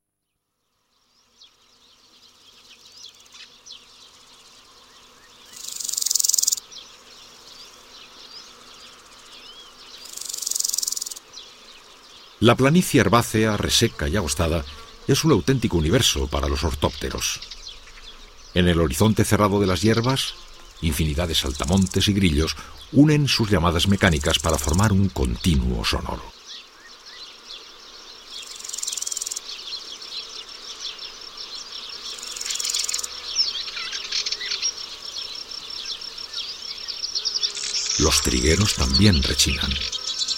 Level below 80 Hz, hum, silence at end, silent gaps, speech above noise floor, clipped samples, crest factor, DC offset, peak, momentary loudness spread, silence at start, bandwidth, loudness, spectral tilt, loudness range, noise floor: -36 dBFS; none; 0 s; none; 58 dB; under 0.1%; 22 dB; under 0.1%; -2 dBFS; 24 LU; 2.7 s; 16.5 kHz; -22 LUFS; -4 dB/octave; 11 LU; -78 dBFS